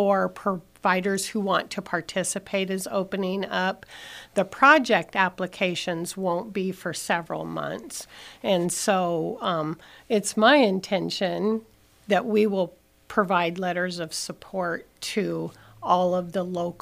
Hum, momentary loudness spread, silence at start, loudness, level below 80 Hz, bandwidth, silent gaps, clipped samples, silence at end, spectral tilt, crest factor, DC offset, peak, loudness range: none; 12 LU; 0 s; -25 LUFS; -64 dBFS; 15.5 kHz; none; under 0.1%; 0.05 s; -4 dB/octave; 22 dB; under 0.1%; -4 dBFS; 4 LU